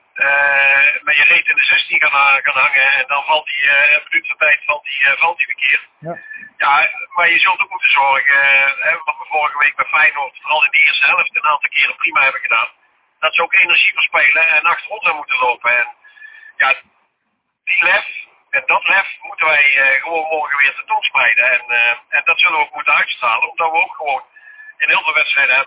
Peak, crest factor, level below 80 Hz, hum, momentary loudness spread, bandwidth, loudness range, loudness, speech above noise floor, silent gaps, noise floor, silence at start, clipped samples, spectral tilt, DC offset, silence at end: -2 dBFS; 14 dB; -68 dBFS; none; 9 LU; 4 kHz; 4 LU; -12 LUFS; 55 dB; none; -70 dBFS; 0.15 s; under 0.1%; -4 dB/octave; under 0.1%; 0 s